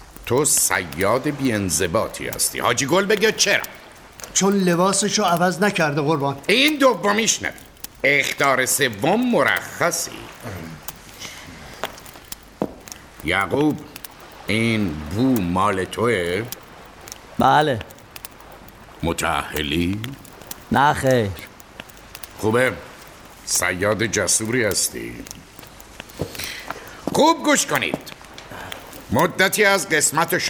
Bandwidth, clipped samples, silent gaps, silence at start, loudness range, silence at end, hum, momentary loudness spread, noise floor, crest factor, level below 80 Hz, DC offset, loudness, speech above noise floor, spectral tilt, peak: over 20 kHz; under 0.1%; none; 0 s; 6 LU; 0 s; none; 20 LU; -42 dBFS; 20 dB; -48 dBFS; under 0.1%; -19 LUFS; 23 dB; -3 dB/octave; -2 dBFS